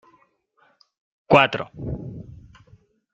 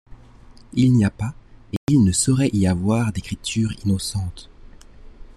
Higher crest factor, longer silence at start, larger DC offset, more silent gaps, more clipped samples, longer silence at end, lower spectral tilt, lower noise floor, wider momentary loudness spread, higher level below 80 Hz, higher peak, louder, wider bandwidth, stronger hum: first, 24 dB vs 16 dB; first, 1.3 s vs 0.1 s; neither; second, none vs 1.77-1.87 s; neither; first, 0.8 s vs 0.05 s; about the same, -6.5 dB/octave vs -5.5 dB/octave; first, -63 dBFS vs -45 dBFS; first, 24 LU vs 12 LU; second, -50 dBFS vs -42 dBFS; first, -2 dBFS vs -6 dBFS; about the same, -21 LUFS vs -20 LUFS; second, 8.4 kHz vs 13 kHz; neither